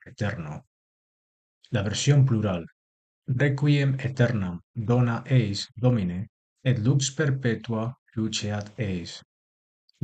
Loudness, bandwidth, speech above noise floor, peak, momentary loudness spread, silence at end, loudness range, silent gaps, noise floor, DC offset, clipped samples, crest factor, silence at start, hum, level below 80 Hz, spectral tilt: -26 LUFS; 9 kHz; over 65 dB; -8 dBFS; 14 LU; 0.85 s; 3 LU; 0.67-1.61 s, 2.72-3.22 s, 4.63-4.74 s, 6.29-6.56 s, 7.98-8.06 s; under -90 dBFS; under 0.1%; under 0.1%; 18 dB; 0.05 s; none; -56 dBFS; -6 dB/octave